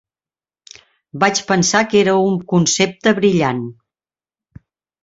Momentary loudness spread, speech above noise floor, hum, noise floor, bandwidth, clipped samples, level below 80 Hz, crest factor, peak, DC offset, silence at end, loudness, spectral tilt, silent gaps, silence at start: 8 LU; over 75 dB; none; under -90 dBFS; 8 kHz; under 0.1%; -56 dBFS; 16 dB; -2 dBFS; under 0.1%; 1.3 s; -15 LUFS; -4 dB/octave; none; 1.15 s